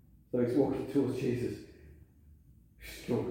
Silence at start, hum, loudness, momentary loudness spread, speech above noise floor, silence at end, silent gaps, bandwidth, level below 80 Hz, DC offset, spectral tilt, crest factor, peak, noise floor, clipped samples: 0.35 s; none; -33 LUFS; 18 LU; 28 dB; 0 s; none; 16.5 kHz; -58 dBFS; under 0.1%; -7.5 dB/octave; 18 dB; -16 dBFS; -59 dBFS; under 0.1%